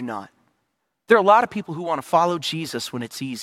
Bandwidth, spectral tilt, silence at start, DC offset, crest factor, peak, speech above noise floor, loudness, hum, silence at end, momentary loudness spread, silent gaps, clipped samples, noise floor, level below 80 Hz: 16 kHz; -4.5 dB/octave; 0 s; under 0.1%; 20 dB; -2 dBFS; 54 dB; -21 LUFS; none; 0 s; 15 LU; none; under 0.1%; -75 dBFS; -70 dBFS